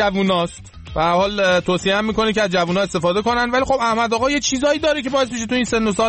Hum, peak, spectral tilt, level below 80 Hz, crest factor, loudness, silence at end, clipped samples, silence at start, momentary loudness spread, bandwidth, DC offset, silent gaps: none; -6 dBFS; -4 dB/octave; -42 dBFS; 12 dB; -18 LUFS; 0 s; under 0.1%; 0 s; 3 LU; 8.8 kHz; under 0.1%; none